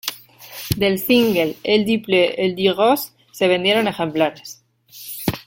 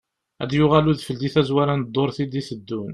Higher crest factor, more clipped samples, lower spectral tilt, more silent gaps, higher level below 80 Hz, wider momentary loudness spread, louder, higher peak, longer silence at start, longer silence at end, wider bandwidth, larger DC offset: about the same, 20 dB vs 20 dB; neither; second, -4.5 dB/octave vs -7.5 dB/octave; neither; about the same, -50 dBFS vs -50 dBFS; first, 18 LU vs 13 LU; first, -18 LUFS vs -21 LUFS; about the same, 0 dBFS vs -2 dBFS; second, 0.05 s vs 0.4 s; about the same, 0.05 s vs 0 s; first, 17 kHz vs 11.5 kHz; neither